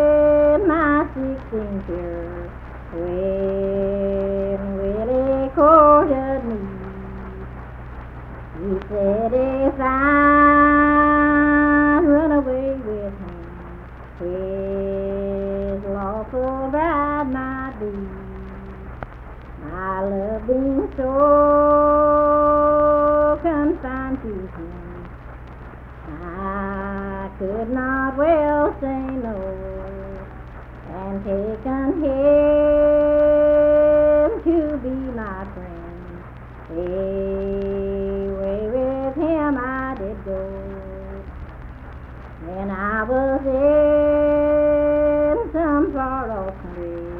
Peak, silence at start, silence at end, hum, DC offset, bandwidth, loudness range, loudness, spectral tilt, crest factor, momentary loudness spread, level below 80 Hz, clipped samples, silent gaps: 0 dBFS; 0 s; 0 s; none; under 0.1%; 4 kHz; 11 LU; -19 LUFS; -10 dB/octave; 18 dB; 22 LU; -36 dBFS; under 0.1%; none